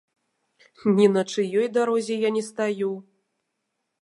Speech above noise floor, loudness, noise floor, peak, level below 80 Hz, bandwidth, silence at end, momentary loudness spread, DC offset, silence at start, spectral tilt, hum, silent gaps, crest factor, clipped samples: 56 dB; -23 LUFS; -79 dBFS; -6 dBFS; -74 dBFS; 11.5 kHz; 1 s; 9 LU; under 0.1%; 0.85 s; -6 dB/octave; none; none; 18 dB; under 0.1%